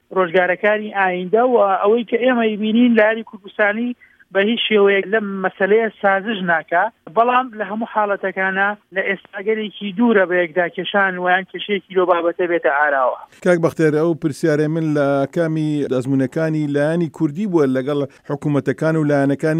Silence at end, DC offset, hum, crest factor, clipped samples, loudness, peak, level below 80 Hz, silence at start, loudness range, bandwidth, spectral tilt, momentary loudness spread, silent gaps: 0 s; under 0.1%; none; 16 dB; under 0.1%; -18 LUFS; -2 dBFS; -68 dBFS; 0.1 s; 3 LU; 12 kHz; -7 dB/octave; 8 LU; none